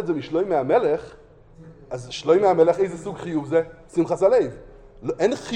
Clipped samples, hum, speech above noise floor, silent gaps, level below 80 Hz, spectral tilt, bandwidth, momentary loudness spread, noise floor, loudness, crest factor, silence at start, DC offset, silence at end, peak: under 0.1%; none; 25 dB; none; -52 dBFS; -6 dB/octave; 9.8 kHz; 14 LU; -46 dBFS; -22 LUFS; 16 dB; 0 s; under 0.1%; 0 s; -6 dBFS